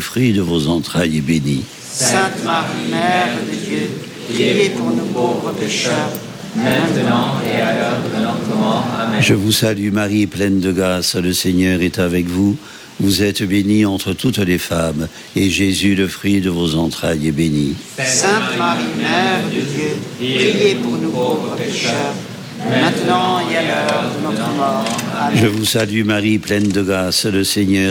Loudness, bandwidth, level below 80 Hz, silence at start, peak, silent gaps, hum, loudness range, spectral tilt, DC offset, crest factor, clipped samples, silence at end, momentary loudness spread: -16 LUFS; 17.5 kHz; -44 dBFS; 0 s; -2 dBFS; none; none; 2 LU; -4.5 dB/octave; under 0.1%; 14 dB; under 0.1%; 0 s; 6 LU